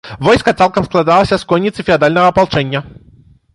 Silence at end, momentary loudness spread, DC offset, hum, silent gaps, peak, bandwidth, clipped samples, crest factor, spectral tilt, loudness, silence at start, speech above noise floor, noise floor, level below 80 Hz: 0.65 s; 5 LU; under 0.1%; none; none; 0 dBFS; 11.5 kHz; under 0.1%; 12 dB; -6 dB/octave; -12 LUFS; 0.05 s; 33 dB; -45 dBFS; -38 dBFS